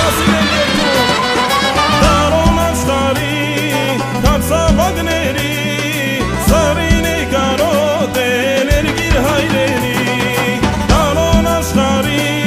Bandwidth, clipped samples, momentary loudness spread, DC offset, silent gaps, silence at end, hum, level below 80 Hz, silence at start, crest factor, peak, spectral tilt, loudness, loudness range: 15.5 kHz; under 0.1%; 4 LU; under 0.1%; none; 0 s; none; -22 dBFS; 0 s; 12 dB; 0 dBFS; -4.5 dB/octave; -13 LUFS; 2 LU